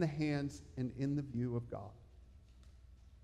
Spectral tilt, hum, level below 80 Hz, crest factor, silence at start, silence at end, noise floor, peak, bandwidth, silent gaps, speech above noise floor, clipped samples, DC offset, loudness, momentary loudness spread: -7.5 dB/octave; none; -60 dBFS; 18 dB; 0 s; 0 s; -60 dBFS; -22 dBFS; 11 kHz; none; 21 dB; under 0.1%; under 0.1%; -40 LUFS; 23 LU